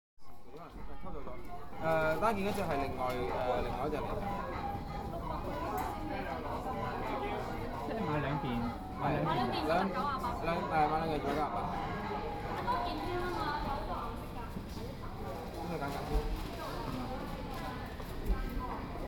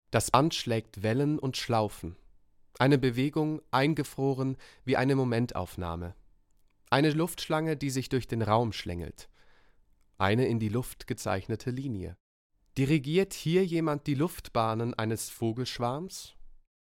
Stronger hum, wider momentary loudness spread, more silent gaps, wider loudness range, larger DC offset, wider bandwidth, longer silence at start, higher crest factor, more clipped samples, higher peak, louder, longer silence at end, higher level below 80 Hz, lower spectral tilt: neither; about the same, 11 LU vs 12 LU; second, none vs 12.20-12.50 s; about the same, 6 LU vs 4 LU; neither; first, 19 kHz vs 16.5 kHz; about the same, 0.15 s vs 0.1 s; second, 18 dB vs 24 dB; neither; second, -18 dBFS vs -6 dBFS; second, -36 LUFS vs -30 LUFS; second, 0 s vs 0.45 s; first, -44 dBFS vs -54 dBFS; about the same, -6.5 dB/octave vs -6 dB/octave